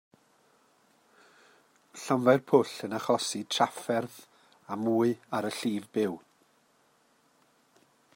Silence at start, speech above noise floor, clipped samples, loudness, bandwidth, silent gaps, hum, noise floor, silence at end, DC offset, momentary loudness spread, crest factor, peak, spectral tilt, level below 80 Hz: 1.95 s; 39 dB; under 0.1%; -29 LUFS; 16 kHz; none; none; -67 dBFS; 1.95 s; under 0.1%; 15 LU; 24 dB; -8 dBFS; -5 dB/octave; -80 dBFS